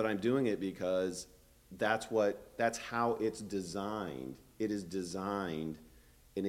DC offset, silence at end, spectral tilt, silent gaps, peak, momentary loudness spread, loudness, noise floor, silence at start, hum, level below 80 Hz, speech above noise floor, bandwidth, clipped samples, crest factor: under 0.1%; 0 s; -5 dB/octave; none; -16 dBFS; 13 LU; -36 LUFS; -61 dBFS; 0 s; none; -64 dBFS; 26 dB; 16.5 kHz; under 0.1%; 20 dB